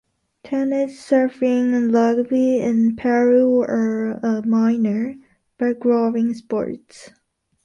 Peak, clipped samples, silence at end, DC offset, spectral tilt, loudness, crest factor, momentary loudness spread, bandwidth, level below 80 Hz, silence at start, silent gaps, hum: -4 dBFS; under 0.1%; 0.6 s; under 0.1%; -7.5 dB/octave; -19 LUFS; 14 dB; 9 LU; 9.6 kHz; -62 dBFS; 0.45 s; none; none